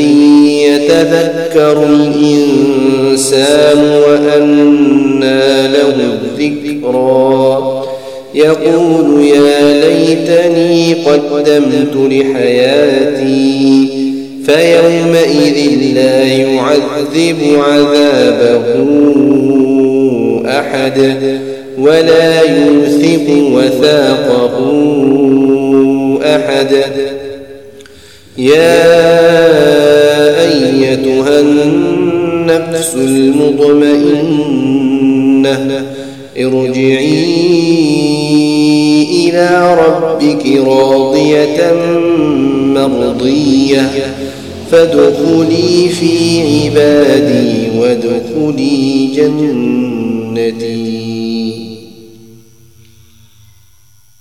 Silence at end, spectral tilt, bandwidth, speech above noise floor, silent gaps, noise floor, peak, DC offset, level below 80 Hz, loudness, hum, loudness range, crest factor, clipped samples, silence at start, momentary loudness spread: 2.2 s; -5.5 dB/octave; 14 kHz; 40 dB; none; -48 dBFS; 0 dBFS; 0.5%; -46 dBFS; -9 LUFS; none; 4 LU; 8 dB; 0.5%; 0 s; 8 LU